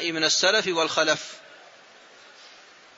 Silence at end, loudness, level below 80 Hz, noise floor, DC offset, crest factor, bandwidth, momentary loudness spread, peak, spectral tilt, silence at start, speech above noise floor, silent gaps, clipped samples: 0.5 s; -22 LUFS; -76 dBFS; -51 dBFS; under 0.1%; 20 dB; 8 kHz; 17 LU; -6 dBFS; -1 dB/octave; 0 s; 27 dB; none; under 0.1%